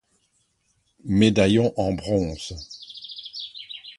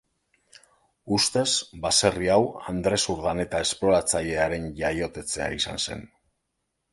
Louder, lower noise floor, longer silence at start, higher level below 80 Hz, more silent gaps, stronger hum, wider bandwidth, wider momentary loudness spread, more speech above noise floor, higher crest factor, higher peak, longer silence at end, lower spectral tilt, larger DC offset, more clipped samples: about the same, -23 LUFS vs -24 LUFS; second, -69 dBFS vs -79 dBFS; about the same, 1.05 s vs 1.05 s; about the same, -46 dBFS vs -48 dBFS; neither; neither; about the same, 11.5 kHz vs 12 kHz; first, 19 LU vs 8 LU; second, 48 dB vs 53 dB; about the same, 22 dB vs 22 dB; about the same, -2 dBFS vs -4 dBFS; second, 0.05 s vs 0.85 s; first, -6 dB/octave vs -3 dB/octave; neither; neither